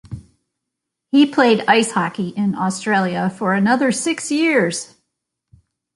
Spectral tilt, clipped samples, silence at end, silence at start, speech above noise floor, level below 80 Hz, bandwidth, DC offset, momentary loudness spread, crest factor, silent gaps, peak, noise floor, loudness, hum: -4.5 dB/octave; under 0.1%; 1.1 s; 0.1 s; 63 dB; -56 dBFS; 11.5 kHz; under 0.1%; 9 LU; 18 dB; none; -2 dBFS; -80 dBFS; -17 LUFS; none